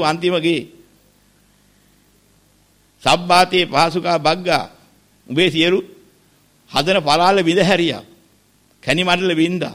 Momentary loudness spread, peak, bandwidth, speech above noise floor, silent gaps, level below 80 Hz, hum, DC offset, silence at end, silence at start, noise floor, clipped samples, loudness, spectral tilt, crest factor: 9 LU; -2 dBFS; 16 kHz; 40 dB; none; -54 dBFS; 50 Hz at -55 dBFS; under 0.1%; 0 s; 0 s; -56 dBFS; under 0.1%; -16 LUFS; -4.5 dB/octave; 16 dB